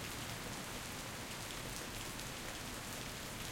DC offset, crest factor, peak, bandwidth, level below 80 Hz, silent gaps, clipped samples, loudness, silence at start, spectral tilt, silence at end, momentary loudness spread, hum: under 0.1%; 20 dB; -26 dBFS; 17 kHz; -58 dBFS; none; under 0.1%; -44 LUFS; 0 s; -2.5 dB/octave; 0 s; 1 LU; none